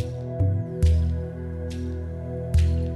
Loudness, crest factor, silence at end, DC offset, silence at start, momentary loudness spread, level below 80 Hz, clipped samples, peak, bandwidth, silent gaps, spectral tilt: -26 LUFS; 14 dB; 0 s; under 0.1%; 0 s; 10 LU; -26 dBFS; under 0.1%; -10 dBFS; 11.5 kHz; none; -8 dB/octave